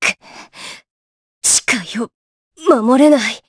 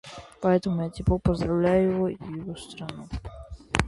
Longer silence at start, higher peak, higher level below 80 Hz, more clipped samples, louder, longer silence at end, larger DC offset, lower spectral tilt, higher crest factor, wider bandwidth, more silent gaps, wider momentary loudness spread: about the same, 0 s vs 0.05 s; about the same, 0 dBFS vs 0 dBFS; second, -60 dBFS vs -40 dBFS; neither; first, -14 LUFS vs -26 LUFS; about the same, 0.1 s vs 0 s; neither; second, -2 dB/octave vs -7 dB/octave; second, 16 dB vs 26 dB; about the same, 11 kHz vs 11.5 kHz; first, 0.91-1.41 s, 2.14-2.51 s vs none; first, 22 LU vs 16 LU